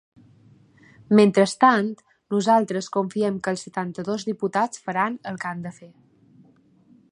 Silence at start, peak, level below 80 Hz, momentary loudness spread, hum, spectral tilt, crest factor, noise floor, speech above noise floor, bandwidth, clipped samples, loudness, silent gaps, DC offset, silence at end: 1.1 s; -2 dBFS; -70 dBFS; 13 LU; none; -5.5 dB/octave; 20 dB; -56 dBFS; 35 dB; 11 kHz; under 0.1%; -22 LUFS; none; under 0.1%; 1.25 s